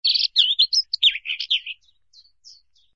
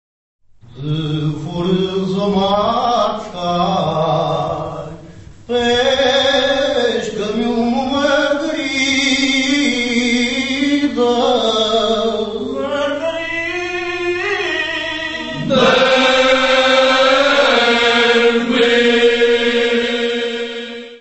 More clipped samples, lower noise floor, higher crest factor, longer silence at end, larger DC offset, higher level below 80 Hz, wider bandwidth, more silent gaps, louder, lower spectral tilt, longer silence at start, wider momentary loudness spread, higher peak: neither; first, -56 dBFS vs -37 dBFS; about the same, 18 dB vs 16 dB; first, 1.25 s vs 0.05 s; neither; second, -68 dBFS vs -46 dBFS; about the same, 8 kHz vs 8.4 kHz; neither; second, -18 LUFS vs -15 LUFS; second, 7 dB/octave vs -4 dB/octave; second, 0.05 s vs 0.7 s; first, 14 LU vs 10 LU; second, -4 dBFS vs 0 dBFS